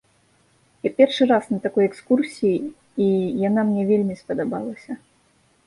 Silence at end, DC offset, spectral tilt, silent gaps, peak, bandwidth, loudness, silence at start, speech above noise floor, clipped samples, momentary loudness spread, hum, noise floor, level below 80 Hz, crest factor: 0.7 s; under 0.1%; -7 dB/octave; none; -2 dBFS; 11.5 kHz; -21 LUFS; 0.85 s; 40 dB; under 0.1%; 12 LU; none; -61 dBFS; -64 dBFS; 18 dB